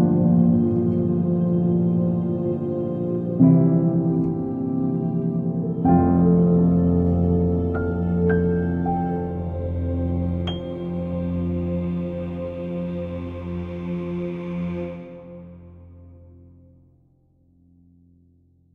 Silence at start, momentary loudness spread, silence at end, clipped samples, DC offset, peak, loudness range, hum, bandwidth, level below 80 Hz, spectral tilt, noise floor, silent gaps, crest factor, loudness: 0 s; 12 LU; 2.45 s; under 0.1%; under 0.1%; -4 dBFS; 12 LU; none; 3.7 kHz; -46 dBFS; -11.5 dB/octave; -59 dBFS; none; 18 dB; -22 LUFS